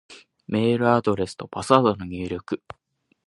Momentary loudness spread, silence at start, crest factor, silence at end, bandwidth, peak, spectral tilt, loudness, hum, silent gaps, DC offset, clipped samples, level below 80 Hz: 14 LU; 0.1 s; 22 dB; 0.7 s; 11.5 kHz; 0 dBFS; -6.5 dB/octave; -23 LUFS; none; none; under 0.1%; under 0.1%; -52 dBFS